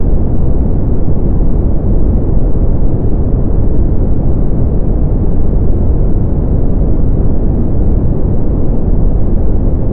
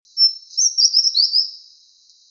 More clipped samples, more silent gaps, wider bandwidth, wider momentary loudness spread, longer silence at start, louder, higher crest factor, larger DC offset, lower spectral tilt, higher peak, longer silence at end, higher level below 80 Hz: neither; neither; second, 1.8 kHz vs 7.2 kHz; second, 1 LU vs 5 LU; second, 0 s vs 0.15 s; about the same, -14 LUFS vs -14 LUFS; second, 6 dB vs 16 dB; neither; first, -14.5 dB/octave vs 9.5 dB/octave; about the same, -2 dBFS vs -4 dBFS; second, 0 s vs 0.7 s; first, -12 dBFS vs -84 dBFS